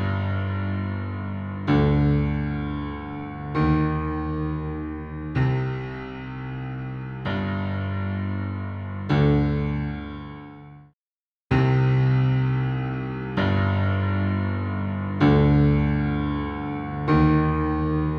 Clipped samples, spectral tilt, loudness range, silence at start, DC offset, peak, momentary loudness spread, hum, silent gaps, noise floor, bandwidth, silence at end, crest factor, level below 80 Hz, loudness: under 0.1%; -9.5 dB/octave; 7 LU; 0 s; under 0.1%; -8 dBFS; 13 LU; none; 10.93-11.50 s; under -90 dBFS; 6 kHz; 0 s; 16 dB; -36 dBFS; -24 LUFS